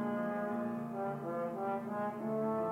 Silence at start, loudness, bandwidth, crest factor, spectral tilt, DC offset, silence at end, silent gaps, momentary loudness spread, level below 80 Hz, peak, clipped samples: 0 s; -38 LUFS; 16 kHz; 10 dB; -8.5 dB/octave; under 0.1%; 0 s; none; 3 LU; -76 dBFS; -26 dBFS; under 0.1%